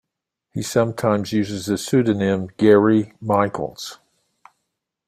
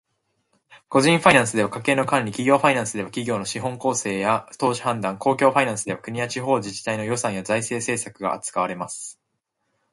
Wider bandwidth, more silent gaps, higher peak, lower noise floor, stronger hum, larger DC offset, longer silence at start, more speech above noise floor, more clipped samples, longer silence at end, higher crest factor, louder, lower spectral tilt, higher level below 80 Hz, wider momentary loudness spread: first, 15.5 kHz vs 11.5 kHz; neither; about the same, -2 dBFS vs 0 dBFS; first, -80 dBFS vs -76 dBFS; neither; neither; second, 0.55 s vs 0.7 s; first, 61 dB vs 54 dB; neither; first, 1.15 s vs 0.8 s; about the same, 18 dB vs 22 dB; about the same, -20 LUFS vs -22 LUFS; first, -6 dB/octave vs -4 dB/octave; about the same, -58 dBFS vs -60 dBFS; first, 15 LU vs 10 LU